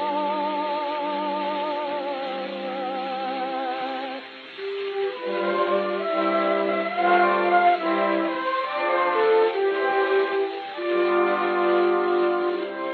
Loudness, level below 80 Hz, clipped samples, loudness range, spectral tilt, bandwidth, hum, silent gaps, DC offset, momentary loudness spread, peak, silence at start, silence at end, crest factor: -24 LUFS; -84 dBFS; under 0.1%; 7 LU; -2 dB/octave; 5 kHz; none; none; under 0.1%; 10 LU; -8 dBFS; 0 s; 0 s; 16 dB